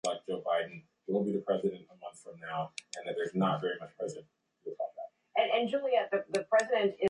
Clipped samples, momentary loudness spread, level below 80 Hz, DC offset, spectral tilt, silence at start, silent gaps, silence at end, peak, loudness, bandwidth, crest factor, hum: under 0.1%; 18 LU; -80 dBFS; under 0.1%; -5 dB/octave; 0.05 s; none; 0 s; -14 dBFS; -33 LUFS; 11 kHz; 18 dB; none